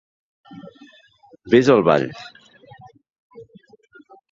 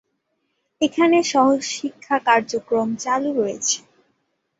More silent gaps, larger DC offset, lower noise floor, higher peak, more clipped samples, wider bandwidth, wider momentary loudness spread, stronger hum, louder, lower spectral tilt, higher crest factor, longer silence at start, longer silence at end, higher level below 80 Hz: first, 3.12-3.30 s vs none; neither; second, -52 dBFS vs -72 dBFS; about the same, -2 dBFS vs -2 dBFS; neither; about the same, 7.6 kHz vs 8 kHz; first, 28 LU vs 8 LU; neither; first, -17 LUFS vs -20 LUFS; first, -6.5 dB/octave vs -2.5 dB/octave; about the same, 22 dB vs 20 dB; second, 0.5 s vs 0.8 s; about the same, 0.9 s vs 0.8 s; first, -60 dBFS vs -66 dBFS